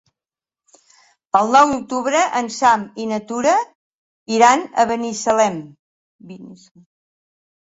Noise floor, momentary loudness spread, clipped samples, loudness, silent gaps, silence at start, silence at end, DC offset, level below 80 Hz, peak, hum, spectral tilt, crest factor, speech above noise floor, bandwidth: under -90 dBFS; 15 LU; under 0.1%; -17 LUFS; 3.75-4.26 s, 5.79-6.19 s; 1.35 s; 1.1 s; under 0.1%; -60 dBFS; 0 dBFS; none; -3.5 dB/octave; 18 dB; over 73 dB; 8 kHz